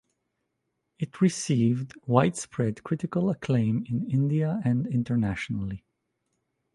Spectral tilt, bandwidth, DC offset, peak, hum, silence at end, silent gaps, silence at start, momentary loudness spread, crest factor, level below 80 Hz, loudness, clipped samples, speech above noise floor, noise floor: -7 dB/octave; 11.5 kHz; under 0.1%; -4 dBFS; none; 0.95 s; none; 1 s; 8 LU; 22 dB; -56 dBFS; -27 LUFS; under 0.1%; 54 dB; -79 dBFS